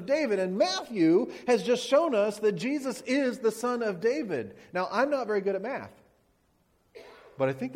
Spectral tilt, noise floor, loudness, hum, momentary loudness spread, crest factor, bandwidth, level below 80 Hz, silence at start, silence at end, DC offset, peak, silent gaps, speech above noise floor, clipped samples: -5 dB/octave; -69 dBFS; -28 LUFS; none; 9 LU; 18 dB; 16 kHz; -72 dBFS; 0 s; 0 s; under 0.1%; -12 dBFS; none; 41 dB; under 0.1%